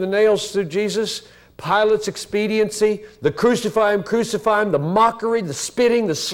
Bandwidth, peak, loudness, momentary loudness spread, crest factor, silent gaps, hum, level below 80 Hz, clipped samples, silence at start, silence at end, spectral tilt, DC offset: 16.5 kHz; -4 dBFS; -19 LUFS; 7 LU; 14 dB; none; none; -54 dBFS; under 0.1%; 0 s; 0 s; -4.5 dB/octave; under 0.1%